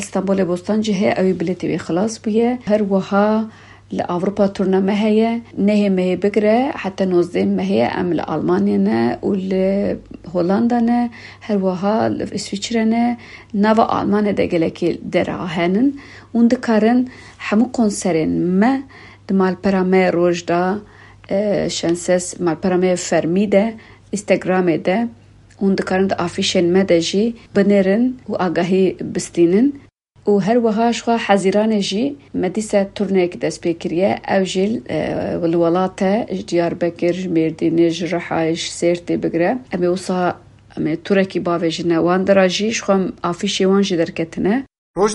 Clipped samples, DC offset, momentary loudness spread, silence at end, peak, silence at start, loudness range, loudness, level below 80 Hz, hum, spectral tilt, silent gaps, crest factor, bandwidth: under 0.1%; under 0.1%; 7 LU; 0 s; -2 dBFS; 0 s; 2 LU; -18 LUFS; -52 dBFS; none; -6 dB/octave; 44.78-44.94 s; 16 dB; 11.5 kHz